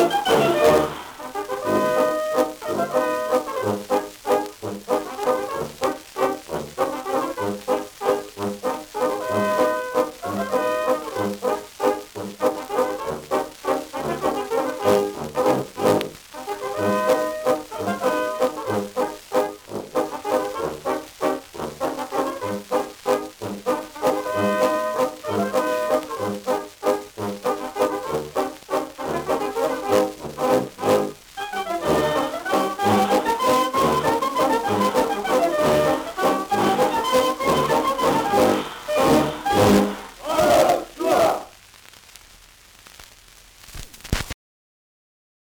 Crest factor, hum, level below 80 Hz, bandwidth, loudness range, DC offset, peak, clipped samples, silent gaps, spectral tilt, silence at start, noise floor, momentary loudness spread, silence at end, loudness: 18 dB; none; -50 dBFS; over 20 kHz; 6 LU; under 0.1%; -4 dBFS; under 0.1%; none; -4.5 dB/octave; 0 s; -49 dBFS; 9 LU; 1.15 s; -22 LUFS